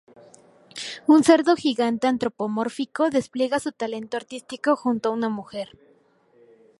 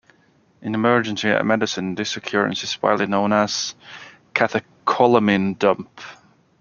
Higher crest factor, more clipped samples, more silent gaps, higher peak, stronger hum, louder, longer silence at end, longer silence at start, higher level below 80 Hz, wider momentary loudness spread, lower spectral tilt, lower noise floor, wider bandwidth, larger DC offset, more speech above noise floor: about the same, 20 dB vs 20 dB; neither; neither; about the same, -2 dBFS vs -2 dBFS; neither; second, -23 LUFS vs -20 LUFS; first, 1.15 s vs 0.45 s; first, 0.75 s vs 0.6 s; about the same, -68 dBFS vs -64 dBFS; about the same, 17 LU vs 18 LU; about the same, -4.5 dB/octave vs -4.5 dB/octave; about the same, -59 dBFS vs -58 dBFS; first, 11.5 kHz vs 7.2 kHz; neither; about the same, 37 dB vs 38 dB